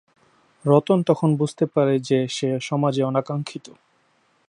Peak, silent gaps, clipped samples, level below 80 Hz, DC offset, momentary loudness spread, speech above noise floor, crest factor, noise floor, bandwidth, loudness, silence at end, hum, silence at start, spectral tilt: -2 dBFS; none; under 0.1%; -70 dBFS; under 0.1%; 11 LU; 43 dB; 20 dB; -64 dBFS; 11 kHz; -21 LUFS; 0.9 s; none; 0.65 s; -7 dB/octave